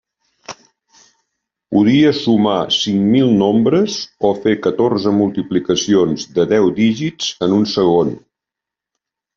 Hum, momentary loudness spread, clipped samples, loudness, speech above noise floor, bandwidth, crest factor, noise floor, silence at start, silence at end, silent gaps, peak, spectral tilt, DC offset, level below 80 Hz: none; 7 LU; under 0.1%; -15 LUFS; 70 dB; 7.6 kHz; 14 dB; -85 dBFS; 0.5 s; 1.2 s; none; -2 dBFS; -5.5 dB/octave; under 0.1%; -54 dBFS